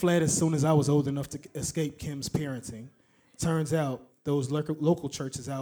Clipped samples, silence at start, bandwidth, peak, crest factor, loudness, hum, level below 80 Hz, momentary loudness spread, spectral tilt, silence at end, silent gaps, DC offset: under 0.1%; 0 s; over 20 kHz; -12 dBFS; 18 dB; -29 LUFS; none; -56 dBFS; 12 LU; -5.5 dB/octave; 0 s; none; under 0.1%